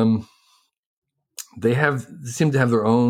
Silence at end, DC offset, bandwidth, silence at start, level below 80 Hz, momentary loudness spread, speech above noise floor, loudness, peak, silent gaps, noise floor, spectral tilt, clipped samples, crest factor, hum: 0 s; under 0.1%; 16 kHz; 0 s; -62 dBFS; 19 LU; 43 dB; -21 LUFS; -4 dBFS; 0.78-1.02 s; -62 dBFS; -6.5 dB/octave; under 0.1%; 16 dB; none